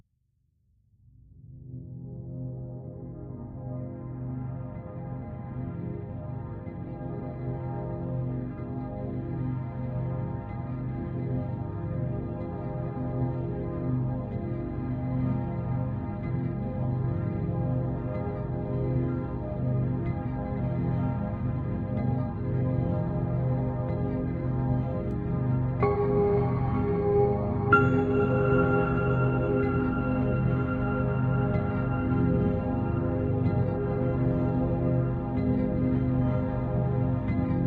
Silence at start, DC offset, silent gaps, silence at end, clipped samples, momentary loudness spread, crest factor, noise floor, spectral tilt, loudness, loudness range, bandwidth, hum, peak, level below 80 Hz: 1.35 s; under 0.1%; none; 0 s; under 0.1%; 12 LU; 20 dB; -72 dBFS; -10 dB/octave; -29 LUFS; 12 LU; 4.3 kHz; none; -8 dBFS; -42 dBFS